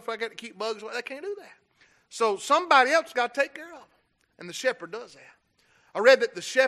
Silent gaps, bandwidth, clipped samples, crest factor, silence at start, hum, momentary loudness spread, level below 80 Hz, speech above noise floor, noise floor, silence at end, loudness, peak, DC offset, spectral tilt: none; 13 kHz; under 0.1%; 22 dB; 0.05 s; none; 21 LU; -82 dBFS; 39 dB; -65 dBFS; 0 s; -25 LUFS; -4 dBFS; under 0.1%; -1.5 dB/octave